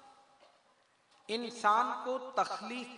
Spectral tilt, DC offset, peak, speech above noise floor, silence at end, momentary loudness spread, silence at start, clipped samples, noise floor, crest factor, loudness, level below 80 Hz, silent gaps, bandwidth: -2.5 dB/octave; under 0.1%; -16 dBFS; 36 dB; 0 s; 11 LU; 0.05 s; under 0.1%; -70 dBFS; 20 dB; -33 LUFS; -88 dBFS; none; 11 kHz